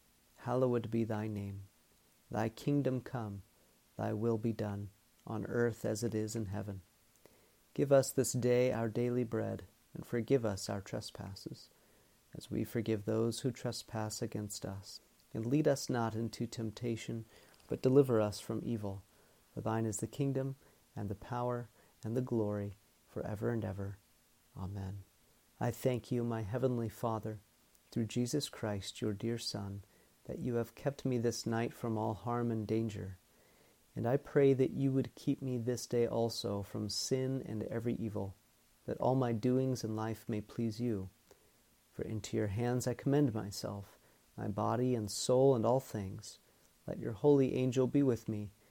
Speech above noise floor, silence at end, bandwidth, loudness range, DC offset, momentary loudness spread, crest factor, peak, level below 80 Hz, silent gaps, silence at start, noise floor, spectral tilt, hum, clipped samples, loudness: 34 dB; 0.2 s; 17.5 kHz; 6 LU; under 0.1%; 16 LU; 20 dB; -16 dBFS; -68 dBFS; none; 0.4 s; -69 dBFS; -6 dB/octave; none; under 0.1%; -36 LUFS